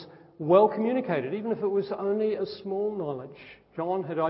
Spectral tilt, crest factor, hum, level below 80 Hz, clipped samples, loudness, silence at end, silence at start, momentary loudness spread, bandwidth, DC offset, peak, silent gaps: -11 dB/octave; 20 dB; none; -72 dBFS; under 0.1%; -27 LUFS; 0 s; 0 s; 16 LU; 5.8 kHz; under 0.1%; -6 dBFS; none